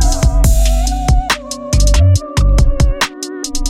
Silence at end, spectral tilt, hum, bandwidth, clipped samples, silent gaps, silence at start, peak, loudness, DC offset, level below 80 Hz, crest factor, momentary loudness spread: 0 s; -4.5 dB/octave; none; 16 kHz; under 0.1%; none; 0 s; 0 dBFS; -14 LUFS; under 0.1%; -12 dBFS; 10 dB; 7 LU